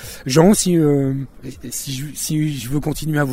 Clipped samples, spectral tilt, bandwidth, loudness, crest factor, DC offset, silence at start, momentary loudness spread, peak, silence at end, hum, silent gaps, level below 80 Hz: under 0.1%; -5.5 dB/octave; 16.5 kHz; -18 LUFS; 18 dB; under 0.1%; 0 s; 14 LU; 0 dBFS; 0 s; none; none; -40 dBFS